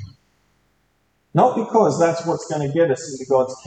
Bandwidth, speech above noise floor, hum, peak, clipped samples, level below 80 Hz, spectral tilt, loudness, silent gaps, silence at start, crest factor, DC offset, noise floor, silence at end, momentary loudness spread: 9 kHz; 47 dB; none; -2 dBFS; under 0.1%; -62 dBFS; -6 dB/octave; -19 LUFS; none; 0 s; 18 dB; under 0.1%; -65 dBFS; 0.05 s; 7 LU